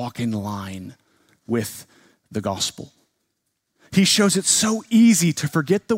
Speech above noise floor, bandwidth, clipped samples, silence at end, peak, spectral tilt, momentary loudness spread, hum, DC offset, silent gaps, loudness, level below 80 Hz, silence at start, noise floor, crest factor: 55 dB; 16 kHz; under 0.1%; 0 s; -4 dBFS; -4 dB/octave; 17 LU; none; under 0.1%; none; -19 LUFS; -62 dBFS; 0 s; -75 dBFS; 18 dB